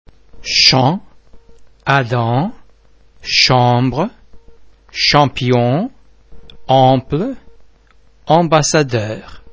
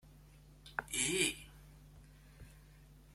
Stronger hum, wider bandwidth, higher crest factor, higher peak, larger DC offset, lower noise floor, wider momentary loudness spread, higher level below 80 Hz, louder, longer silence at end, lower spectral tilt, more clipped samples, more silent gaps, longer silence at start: neither; second, 8 kHz vs 16.5 kHz; second, 16 dB vs 26 dB; first, 0 dBFS vs -16 dBFS; neither; second, -49 dBFS vs -60 dBFS; second, 15 LU vs 27 LU; first, -44 dBFS vs -60 dBFS; first, -14 LUFS vs -36 LUFS; about the same, 0 s vs 0.05 s; first, -4.5 dB/octave vs -1.5 dB/octave; neither; neither; first, 0.35 s vs 0.05 s